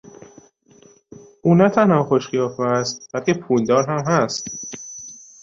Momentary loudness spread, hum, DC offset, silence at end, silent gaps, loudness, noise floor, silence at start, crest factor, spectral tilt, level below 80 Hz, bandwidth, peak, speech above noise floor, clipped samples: 17 LU; none; under 0.1%; 0.25 s; none; -19 LUFS; -51 dBFS; 1.45 s; 18 dB; -5.5 dB/octave; -60 dBFS; 7.8 kHz; -2 dBFS; 33 dB; under 0.1%